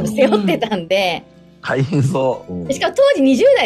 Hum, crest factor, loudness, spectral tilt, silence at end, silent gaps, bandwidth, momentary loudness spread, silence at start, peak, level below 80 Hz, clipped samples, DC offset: none; 14 dB; -16 LUFS; -6 dB/octave; 0 s; none; 13.5 kHz; 11 LU; 0 s; -2 dBFS; -54 dBFS; under 0.1%; under 0.1%